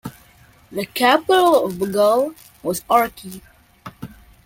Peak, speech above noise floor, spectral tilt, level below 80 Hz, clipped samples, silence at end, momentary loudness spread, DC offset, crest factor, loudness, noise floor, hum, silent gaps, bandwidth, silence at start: -2 dBFS; 32 dB; -4 dB/octave; -54 dBFS; under 0.1%; 0.4 s; 23 LU; under 0.1%; 18 dB; -18 LUFS; -50 dBFS; none; none; 17 kHz; 0.05 s